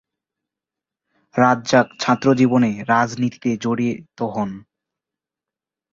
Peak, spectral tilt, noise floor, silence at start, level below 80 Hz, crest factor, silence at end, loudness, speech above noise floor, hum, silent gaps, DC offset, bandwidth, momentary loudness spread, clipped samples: -2 dBFS; -6 dB/octave; -88 dBFS; 1.35 s; -60 dBFS; 18 dB; 1.35 s; -19 LUFS; 70 dB; none; none; under 0.1%; 7.6 kHz; 11 LU; under 0.1%